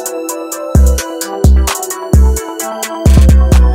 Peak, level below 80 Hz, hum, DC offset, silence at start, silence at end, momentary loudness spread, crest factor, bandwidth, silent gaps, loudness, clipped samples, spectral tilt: 0 dBFS; -10 dBFS; none; under 0.1%; 0 s; 0 s; 12 LU; 10 dB; 16 kHz; none; -12 LUFS; under 0.1%; -5.5 dB/octave